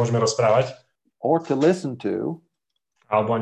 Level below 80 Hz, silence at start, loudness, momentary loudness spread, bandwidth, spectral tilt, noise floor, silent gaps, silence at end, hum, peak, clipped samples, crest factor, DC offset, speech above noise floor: -64 dBFS; 0 s; -22 LUFS; 11 LU; 10.5 kHz; -6 dB/octave; -79 dBFS; none; 0 s; none; -6 dBFS; under 0.1%; 16 dB; under 0.1%; 58 dB